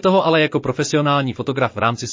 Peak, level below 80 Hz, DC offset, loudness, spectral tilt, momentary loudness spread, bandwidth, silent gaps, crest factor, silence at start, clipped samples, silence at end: -4 dBFS; -52 dBFS; under 0.1%; -18 LUFS; -5 dB/octave; 6 LU; 7.6 kHz; none; 14 dB; 0.05 s; under 0.1%; 0 s